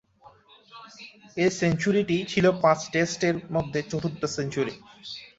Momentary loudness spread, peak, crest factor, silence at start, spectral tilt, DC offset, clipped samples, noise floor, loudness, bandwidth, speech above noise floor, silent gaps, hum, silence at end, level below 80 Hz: 20 LU; -6 dBFS; 20 dB; 0.25 s; -5.5 dB/octave; under 0.1%; under 0.1%; -55 dBFS; -25 LUFS; 8 kHz; 30 dB; none; none; 0.1 s; -58 dBFS